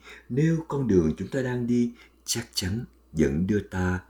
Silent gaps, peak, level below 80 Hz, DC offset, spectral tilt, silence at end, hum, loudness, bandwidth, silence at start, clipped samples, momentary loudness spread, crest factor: none; -8 dBFS; -46 dBFS; under 0.1%; -5.5 dB/octave; 0.1 s; none; -27 LUFS; over 20 kHz; 0.05 s; under 0.1%; 8 LU; 18 dB